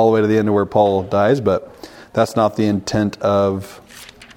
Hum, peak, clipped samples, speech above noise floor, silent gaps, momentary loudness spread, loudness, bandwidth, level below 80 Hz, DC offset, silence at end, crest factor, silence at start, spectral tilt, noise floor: none; -2 dBFS; under 0.1%; 24 dB; none; 15 LU; -17 LUFS; 17 kHz; -50 dBFS; under 0.1%; 0.1 s; 16 dB; 0 s; -6.5 dB/octave; -40 dBFS